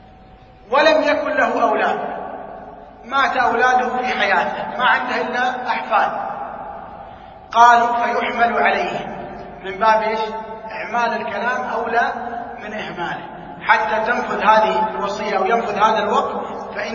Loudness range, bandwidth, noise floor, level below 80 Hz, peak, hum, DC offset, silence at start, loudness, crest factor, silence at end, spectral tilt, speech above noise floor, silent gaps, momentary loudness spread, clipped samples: 4 LU; 7.4 kHz; -44 dBFS; -52 dBFS; 0 dBFS; none; under 0.1%; 0.65 s; -18 LUFS; 18 dB; 0 s; -4 dB/octave; 26 dB; none; 16 LU; under 0.1%